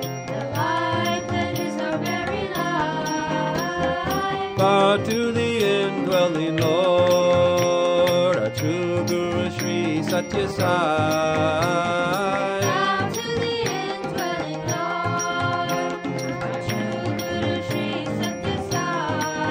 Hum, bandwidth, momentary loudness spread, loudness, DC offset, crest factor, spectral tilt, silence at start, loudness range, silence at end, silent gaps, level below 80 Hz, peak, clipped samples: none; 16 kHz; 7 LU; -22 LUFS; under 0.1%; 16 dB; -5 dB/octave; 0 s; 6 LU; 0 s; none; -52 dBFS; -6 dBFS; under 0.1%